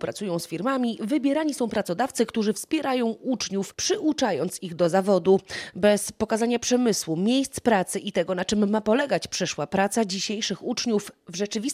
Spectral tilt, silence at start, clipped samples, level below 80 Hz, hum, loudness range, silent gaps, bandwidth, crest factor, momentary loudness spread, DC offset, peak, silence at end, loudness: -4 dB/octave; 0 s; under 0.1%; -60 dBFS; none; 2 LU; none; 15.5 kHz; 16 dB; 6 LU; under 0.1%; -8 dBFS; 0 s; -25 LUFS